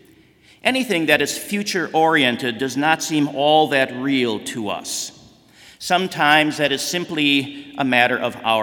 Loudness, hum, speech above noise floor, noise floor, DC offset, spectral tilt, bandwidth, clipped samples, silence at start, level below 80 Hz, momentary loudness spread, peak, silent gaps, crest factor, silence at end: -19 LUFS; none; 33 dB; -52 dBFS; under 0.1%; -3.5 dB/octave; 18 kHz; under 0.1%; 0.65 s; -64 dBFS; 10 LU; 0 dBFS; none; 20 dB; 0 s